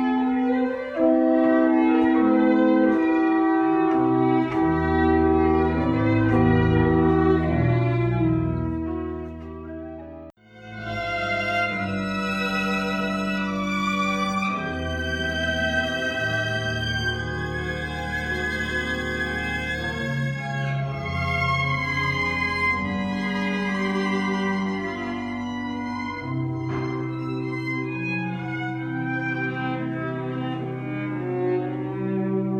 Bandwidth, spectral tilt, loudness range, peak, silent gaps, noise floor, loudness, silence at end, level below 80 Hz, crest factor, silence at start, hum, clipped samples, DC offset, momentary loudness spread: 9.8 kHz; -7 dB/octave; 8 LU; -6 dBFS; none; -43 dBFS; -23 LUFS; 0 s; -42 dBFS; 16 dB; 0 s; none; under 0.1%; under 0.1%; 10 LU